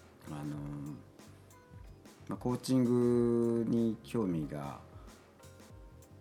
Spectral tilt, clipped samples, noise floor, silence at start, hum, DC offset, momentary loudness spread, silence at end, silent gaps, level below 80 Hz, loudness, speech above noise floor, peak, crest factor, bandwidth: -7.5 dB/octave; under 0.1%; -56 dBFS; 0.25 s; none; under 0.1%; 26 LU; 0.05 s; none; -60 dBFS; -33 LUFS; 25 dB; -20 dBFS; 16 dB; 14 kHz